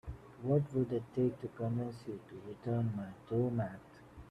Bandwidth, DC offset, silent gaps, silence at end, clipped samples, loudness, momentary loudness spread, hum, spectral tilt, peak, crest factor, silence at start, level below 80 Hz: 9.4 kHz; under 0.1%; none; 0 s; under 0.1%; -37 LUFS; 16 LU; none; -10 dB/octave; -20 dBFS; 18 dB; 0.05 s; -60 dBFS